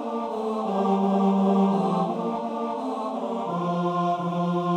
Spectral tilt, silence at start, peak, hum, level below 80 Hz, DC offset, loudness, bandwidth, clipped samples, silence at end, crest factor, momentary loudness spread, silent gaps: -8.5 dB/octave; 0 s; -10 dBFS; none; -74 dBFS; under 0.1%; -25 LUFS; 9 kHz; under 0.1%; 0 s; 14 dB; 8 LU; none